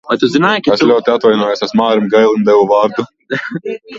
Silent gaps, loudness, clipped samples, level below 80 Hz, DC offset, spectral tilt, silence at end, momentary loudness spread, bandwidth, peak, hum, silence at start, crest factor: none; -12 LUFS; under 0.1%; -56 dBFS; under 0.1%; -6 dB/octave; 0 s; 11 LU; 7.6 kHz; 0 dBFS; none; 0.05 s; 12 dB